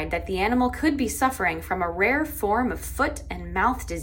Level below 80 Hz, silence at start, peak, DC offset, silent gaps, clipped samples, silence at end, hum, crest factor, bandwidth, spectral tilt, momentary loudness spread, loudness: -38 dBFS; 0 s; -8 dBFS; under 0.1%; none; under 0.1%; 0 s; none; 16 dB; 17 kHz; -5 dB/octave; 5 LU; -24 LUFS